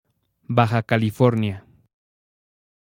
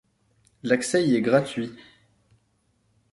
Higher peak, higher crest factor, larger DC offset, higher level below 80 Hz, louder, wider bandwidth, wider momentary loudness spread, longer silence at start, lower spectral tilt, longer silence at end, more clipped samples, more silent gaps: first, 0 dBFS vs -4 dBFS; about the same, 22 dB vs 22 dB; neither; first, -60 dBFS vs -66 dBFS; first, -21 LUFS vs -24 LUFS; first, 16 kHz vs 11.5 kHz; second, 8 LU vs 14 LU; second, 0.5 s vs 0.65 s; first, -8 dB/octave vs -5 dB/octave; about the same, 1.35 s vs 1.35 s; neither; neither